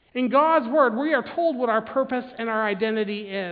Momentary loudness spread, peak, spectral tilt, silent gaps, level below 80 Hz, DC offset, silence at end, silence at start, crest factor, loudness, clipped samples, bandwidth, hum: 9 LU; -6 dBFS; -9 dB/octave; none; -68 dBFS; under 0.1%; 0 s; 0.15 s; 16 dB; -23 LUFS; under 0.1%; 4.9 kHz; none